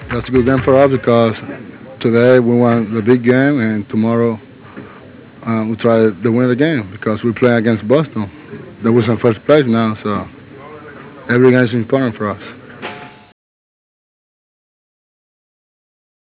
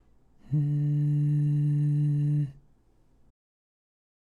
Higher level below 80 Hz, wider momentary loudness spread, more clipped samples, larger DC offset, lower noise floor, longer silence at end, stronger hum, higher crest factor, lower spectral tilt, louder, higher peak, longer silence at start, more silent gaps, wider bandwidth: first, -44 dBFS vs -62 dBFS; first, 22 LU vs 5 LU; neither; neither; second, -37 dBFS vs -62 dBFS; first, 3.2 s vs 1.8 s; neither; first, 16 dB vs 10 dB; about the same, -11.5 dB/octave vs -11 dB/octave; first, -14 LUFS vs -27 LUFS; first, 0 dBFS vs -18 dBFS; second, 0 s vs 0.5 s; neither; first, 4 kHz vs 3 kHz